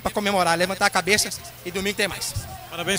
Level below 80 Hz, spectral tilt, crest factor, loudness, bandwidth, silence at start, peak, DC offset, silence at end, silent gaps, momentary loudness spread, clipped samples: -46 dBFS; -2.5 dB/octave; 22 dB; -22 LUFS; 16.5 kHz; 0 s; -2 dBFS; under 0.1%; 0 s; none; 12 LU; under 0.1%